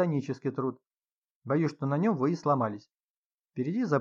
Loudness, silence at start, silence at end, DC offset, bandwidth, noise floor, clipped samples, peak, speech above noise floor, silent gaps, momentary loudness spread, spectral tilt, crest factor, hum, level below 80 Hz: -30 LUFS; 0 s; 0 s; under 0.1%; 7.4 kHz; under -90 dBFS; under 0.1%; -14 dBFS; over 61 dB; 0.87-0.91 s, 1.11-1.42 s, 2.94-3.44 s; 10 LU; -8.5 dB/octave; 16 dB; none; -84 dBFS